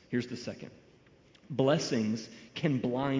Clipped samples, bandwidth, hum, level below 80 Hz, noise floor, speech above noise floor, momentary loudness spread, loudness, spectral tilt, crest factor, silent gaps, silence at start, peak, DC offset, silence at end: under 0.1%; 7.6 kHz; none; -66 dBFS; -61 dBFS; 29 dB; 15 LU; -32 LUFS; -6 dB/octave; 20 dB; none; 0.1 s; -14 dBFS; under 0.1%; 0 s